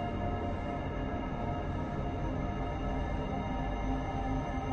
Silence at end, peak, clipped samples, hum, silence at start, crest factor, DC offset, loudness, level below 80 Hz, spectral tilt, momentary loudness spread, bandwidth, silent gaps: 0 s; -20 dBFS; under 0.1%; none; 0 s; 14 dB; under 0.1%; -36 LUFS; -40 dBFS; -8 dB/octave; 2 LU; 7 kHz; none